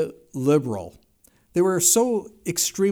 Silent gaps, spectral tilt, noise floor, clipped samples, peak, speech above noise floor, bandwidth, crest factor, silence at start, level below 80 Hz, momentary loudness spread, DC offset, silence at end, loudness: none; -4 dB/octave; -60 dBFS; under 0.1%; -6 dBFS; 37 dB; over 20 kHz; 18 dB; 0 s; -60 dBFS; 13 LU; under 0.1%; 0 s; -21 LUFS